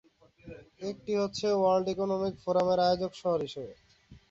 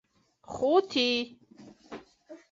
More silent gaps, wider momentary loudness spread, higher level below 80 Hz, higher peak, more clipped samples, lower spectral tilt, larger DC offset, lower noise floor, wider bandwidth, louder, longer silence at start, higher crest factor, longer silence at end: neither; second, 19 LU vs 22 LU; first, -62 dBFS vs -68 dBFS; about the same, -14 dBFS vs -12 dBFS; neither; first, -6 dB/octave vs -3.5 dB/octave; neither; about the same, -51 dBFS vs -54 dBFS; about the same, 7.8 kHz vs 7.8 kHz; second, -30 LUFS vs -27 LUFS; about the same, 0.45 s vs 0.5 s; about the same, 16 dB vs 20 dB; about the same, 0.15 s vs 0.15 s